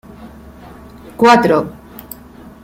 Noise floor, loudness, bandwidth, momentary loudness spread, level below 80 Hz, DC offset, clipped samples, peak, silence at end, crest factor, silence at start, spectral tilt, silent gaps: -38 dBFS; -12 LUFS; 16.5 kHz; 25 LU; -46 dBFS; under 0.1%; under 0.1%; 0 dBFS; 0.15 s; 16 dB; 0.2 s; -5.5 dB/octave; none